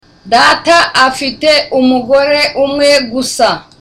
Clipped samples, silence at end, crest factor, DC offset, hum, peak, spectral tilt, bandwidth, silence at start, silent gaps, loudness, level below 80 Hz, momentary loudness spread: under 0.1%; 0.2 s; 10 dB; under 0.1%; none; 0 dBFS; -2.5 dB/octave; 15.5 kHz; 0.25 s; none; -9 LUFS; -44 dBFS; 5 LU